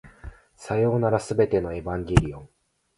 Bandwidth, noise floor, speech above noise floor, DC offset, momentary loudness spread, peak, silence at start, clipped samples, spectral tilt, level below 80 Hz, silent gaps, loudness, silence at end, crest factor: 11.5 kHz; -44 dBFS; 21 dB; under 0.1%; 21 LU; 0 dBFS; 0.05 s; under 0.1%; -7 dB/octave; -38 dBFS; none; -24 LUFS; 0.5 s; 24 dB